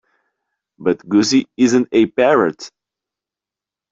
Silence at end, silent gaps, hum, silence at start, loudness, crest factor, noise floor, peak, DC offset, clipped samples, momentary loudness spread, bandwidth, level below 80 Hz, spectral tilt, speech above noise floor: 1.25 s; none; none; 0.8 s; -16 LUFS; 16 dB; -88 dBFS; -2 dBFS; under 0.1%; under 0.1%; 9 LU; 7.8 kHz; -60 dBFS; -4.5 dB/octave; 73 dB